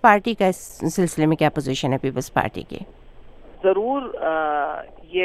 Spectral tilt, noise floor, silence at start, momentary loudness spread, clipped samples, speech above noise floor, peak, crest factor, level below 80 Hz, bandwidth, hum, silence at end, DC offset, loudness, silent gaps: -5.5 dB/octave; -42 dBFS; 0.05 s; 13 LU; under 0.1%; 21 dB; 0 dBFS; 22 dB; -48 dBFS; 15.5 kHz; none; 0 s; under 0.1%; -22 LUFS; none